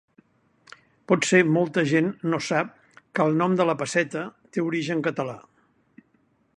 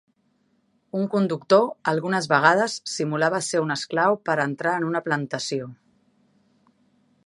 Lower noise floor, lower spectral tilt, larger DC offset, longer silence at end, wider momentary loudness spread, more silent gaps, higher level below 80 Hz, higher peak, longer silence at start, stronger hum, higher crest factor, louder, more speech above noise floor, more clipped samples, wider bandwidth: about the same, -66 dBFS vs -67 dBFS; about the same, -5.5 dB/octave vs -4.5 dB/octave; neither; second, 1.2 s vs 1.55 s; first, 13 LU vs 9 LU; neither; about the same, -70 dBFS vs -74 dBFS; about the same, -4 dBFS vs -2 dBFS; first, 1.1 s vs 0.95 s; neither; about the same, 22 dB vs 22 dB; about the same, -24 LUFS vs -23 LUFS; about the same, 43 dB vs 44 dB; neither; about the same, 11 kHz vs 11.5 kHz